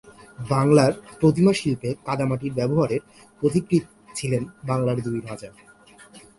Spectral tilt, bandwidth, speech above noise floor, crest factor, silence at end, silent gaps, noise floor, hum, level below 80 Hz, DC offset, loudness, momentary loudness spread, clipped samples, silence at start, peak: -7 dB/octave; 11.5 kHz; 27 dB; 20 dB; 0.2 s; none; -49 dBFS; none; -54 dBFS; under 0.1%; -23 LUFS; 13 LU; under 0.1%; 0.05 s; -4 dBFS